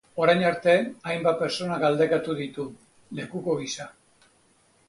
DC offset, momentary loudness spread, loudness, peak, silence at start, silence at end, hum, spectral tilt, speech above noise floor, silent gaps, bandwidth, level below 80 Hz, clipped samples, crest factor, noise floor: under 0.1%; 16 LU; -25 LUFS; -6 dBFS; 0.15 s; 1 s; none; -5 dB/octave; 38 dB; none; 11.5 kHz; -66 dBFS; under 0.1%; 20 dB; -63 dBFS